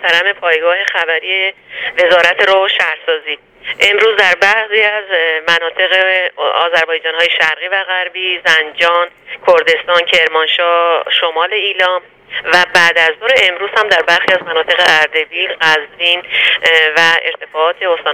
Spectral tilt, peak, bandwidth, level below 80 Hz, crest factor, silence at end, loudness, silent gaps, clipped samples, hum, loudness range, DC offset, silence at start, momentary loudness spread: -1 dB/octave; 0 dBFS; 17.5 kHz; -56 dBFS; 12 dB; 0 s; -11 LUFS; none; 0.2%; none; 2 LU; under 0.1%; 0 s; 7 LU